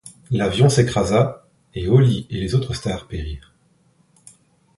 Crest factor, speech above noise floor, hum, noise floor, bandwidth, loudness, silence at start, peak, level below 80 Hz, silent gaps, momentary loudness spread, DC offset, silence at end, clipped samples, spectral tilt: 18 dB; 41 dB; none; -59 dBFS; 11.5 kHz; -19 LUFS; 0.05 s; -2 dBFS; -38 dBFS; none; 15 LU; under 0.1%; 1.4 s; under 0.1%; -6.5 dB/octave